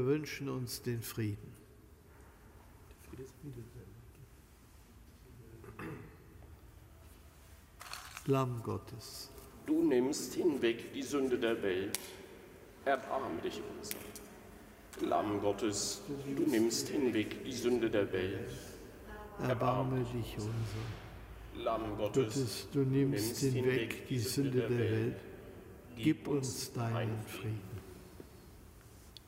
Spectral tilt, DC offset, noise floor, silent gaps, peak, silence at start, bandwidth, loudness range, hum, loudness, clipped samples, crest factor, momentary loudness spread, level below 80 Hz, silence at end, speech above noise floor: -5.5 dB/octave; under 0.1%; -59 dBFS; none; -10 dBFS; 0 s; 16 kHz; 19 LU; none; -36 LUFS; under 0.1%; 28 dB; 22 LU; -60 dBFS; 0 s; 24 dB